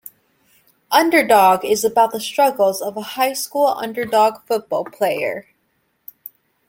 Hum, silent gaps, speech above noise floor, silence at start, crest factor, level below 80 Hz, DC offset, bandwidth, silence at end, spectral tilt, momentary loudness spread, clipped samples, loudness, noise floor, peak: none; none; 50 dB; 0.9 s; 18 dB; -66 dBFS; under 0.1%; 17 kHz; 1.3 s; -3 dB/octave; 12 LU; under 0.1%; -17 LUFS; -67 dBFS; 0 dBFS